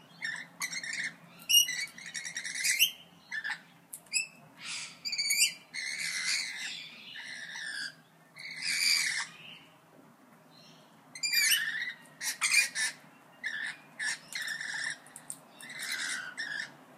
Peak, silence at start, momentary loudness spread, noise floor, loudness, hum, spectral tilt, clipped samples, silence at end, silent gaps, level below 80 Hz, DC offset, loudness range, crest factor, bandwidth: -10 dBFS; 0 s; 18 LU; -59 dBFS; -31 LUFS; none; 2.5 dB/octave; under 0.1%; 0 s; none; under -90 dBFS; under 0.1%; 7 LU; 24 dB; 15.5 kHz